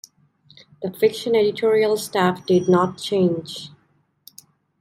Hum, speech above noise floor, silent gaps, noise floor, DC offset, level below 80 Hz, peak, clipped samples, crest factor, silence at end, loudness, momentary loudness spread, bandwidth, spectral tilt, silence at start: none; 44 dB; none; -64 dBFS; under 0.1%; -66 dBFS; -4 dBFS; under 0.1%; 18 dB; 1.1 s; -20 LUFS; 14 LU; 16 kHz; -5.5 dB/octave; 0.8 s